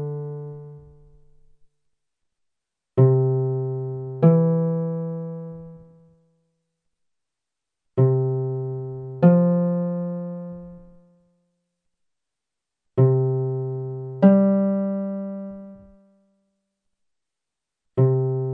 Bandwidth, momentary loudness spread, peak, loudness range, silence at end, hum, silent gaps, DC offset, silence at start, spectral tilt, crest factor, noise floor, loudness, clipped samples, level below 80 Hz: 3 kHz; 18 LU; -4 dBFS; 9 LU; 0 s; none; none; under 0.1%; 0 s; -13 dB/octave; 20 dB; -86 dBFS; -22 LUFS; under 0.1%; -62 dBFS